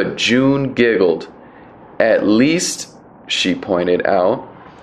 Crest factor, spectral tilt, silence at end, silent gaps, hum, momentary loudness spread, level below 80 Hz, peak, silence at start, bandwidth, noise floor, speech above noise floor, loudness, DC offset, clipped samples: 16 dB; -4 dB/octave; 0.1 s; none; none; 10 LU; -52 dBFS; 0 dBFS; 0 s; 13.5 kHz; -40 dBFS; 25 dB; -16 LUFS; under 0.1%; under 0.1%